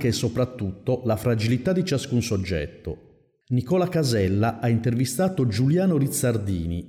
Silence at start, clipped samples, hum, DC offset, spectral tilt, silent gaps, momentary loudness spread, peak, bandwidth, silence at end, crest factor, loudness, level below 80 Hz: 0 s; under 0.1%; none; under 0.1%; -6 dB/octave; none; 7 LU; -14 dBFS; 16 kHz; 0 s; 10 dB; -24 LUFS; -46 dBFS